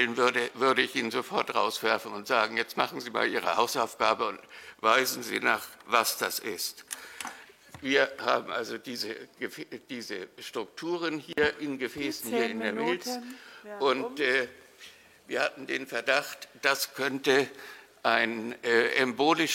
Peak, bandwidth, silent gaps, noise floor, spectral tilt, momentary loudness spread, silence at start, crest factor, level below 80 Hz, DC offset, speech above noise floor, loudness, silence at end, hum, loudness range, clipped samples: -6 dBFS; 16.5 kHz; none; -53 dBFS; -2.5 dB/octave; 14 LU; 0 s; 24 dB; -72 dBFS; under 0.1%; 23 dB; -29 LUFS; 0 s; none; 5 LU; under 0.1%